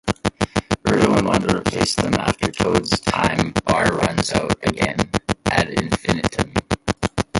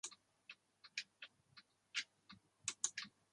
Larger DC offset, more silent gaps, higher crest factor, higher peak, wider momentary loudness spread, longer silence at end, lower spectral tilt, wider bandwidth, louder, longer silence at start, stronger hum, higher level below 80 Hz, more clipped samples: neither; neither; second, 20 dB vs 30 dB; first, 0 dBFS vs -22 dBFS; second, 5 LU vs 22 LU; second, 0 s vs 0.25 s; first, -5 dB/octave vs 2 dB/octave; about the same, 11.5 kHz vs 11.5 kHz; first, -20 LUFS vs -47 LUFS; about the same, 0.05 s vs 0.05 s; neither; first, -38 dBFS vs under -90 dBFS; neither